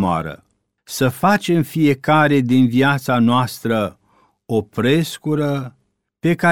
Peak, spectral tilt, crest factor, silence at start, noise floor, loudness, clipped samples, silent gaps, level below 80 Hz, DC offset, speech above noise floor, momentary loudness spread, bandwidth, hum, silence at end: -2 dBFS; -6 dB/octave; 16 dB; 0 s; -47 dBFS; -17 LUFS; under 0.1%; none; -54 dBFS; 0.3%; 31 dB; 9 LU; 18.5 kHz; none; 0 s